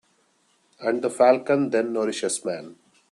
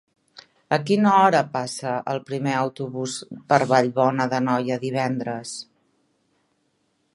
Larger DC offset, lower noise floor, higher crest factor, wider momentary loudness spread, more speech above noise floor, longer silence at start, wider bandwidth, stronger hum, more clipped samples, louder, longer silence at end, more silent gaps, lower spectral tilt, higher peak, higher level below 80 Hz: neither; second, -65 dBFS vs -69 dBFS; about the same, 20 dB vs 22 dB; about the same, 11 LU vs 12 LU; second, 43 dB vs 48 dB; about the same, 0.8 s vs 0.7 s; about the same, 12.5 kHz vs 11.5 kHz; neither; neither; about the same, -23 LUFS vs -22 LUFS; second, 0.4 s vs 1.5 s; neither; second, -4 dB/octave vs -5.5 dB/octave; about the same, -4 dBFS vs -2 dBFS; about the same, -74 dBFS vs -70 dBFS